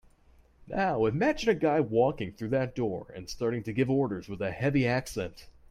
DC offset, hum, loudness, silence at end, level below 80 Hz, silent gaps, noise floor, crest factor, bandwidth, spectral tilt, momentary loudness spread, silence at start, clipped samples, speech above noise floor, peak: under 0.1%; none; -29 LUFS; 0.2 s; -54 dBFS; none; -60 dBFS; 18 dB; 15 kHz; -6.5 dB/octave; 10 LU; 0.65 s; under 0.1%; 32 dB; -12 dBFS